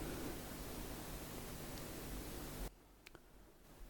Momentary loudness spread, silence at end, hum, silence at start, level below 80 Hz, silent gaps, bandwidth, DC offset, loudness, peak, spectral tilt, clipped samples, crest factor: 15 LU; 0 s; none; 0 s; -54 dBFS; none; 18 kHz; under 0.1%; -49 LUFS; -32 dBFS; -4 dB/octave; under 0.1%; 16 dB